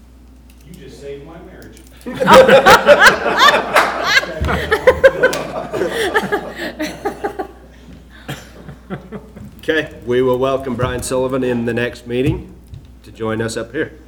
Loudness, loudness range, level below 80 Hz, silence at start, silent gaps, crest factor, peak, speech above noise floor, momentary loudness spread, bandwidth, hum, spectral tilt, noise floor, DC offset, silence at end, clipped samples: -14 LUFS; 14 LU; -38 dBFS; 0.7 s; none; 16 dB; 0 dBFS; 28 dB; 23 LU; over 20 kHz; none; -4 dB/octave; -41 dBFS; under 0.1%; 0.15 s; 0.2%